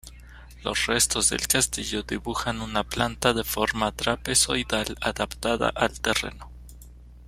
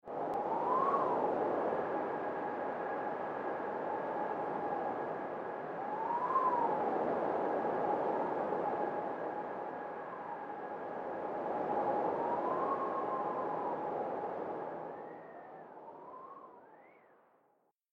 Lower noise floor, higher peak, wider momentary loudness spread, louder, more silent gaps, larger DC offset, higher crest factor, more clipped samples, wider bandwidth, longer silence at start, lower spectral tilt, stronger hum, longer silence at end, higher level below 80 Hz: second, -46 dBFS vs -75 dBFS; first, -4 dBFS vs -20 dBFS; second, 8 LU vs 13 LU; first, -24 LUFS vs -36 LUFS; neither; neither; first, 24 dB vs 18 dB; neither; first, 16 kHz vs 7.6 kHz; about the same, 0.05 s vs 0.05 s; second, -2 dB/octave vs -8 dB/octave; neither; second, 0 s vs 0.95 s; first, -42 dBFS vs -78 dBFS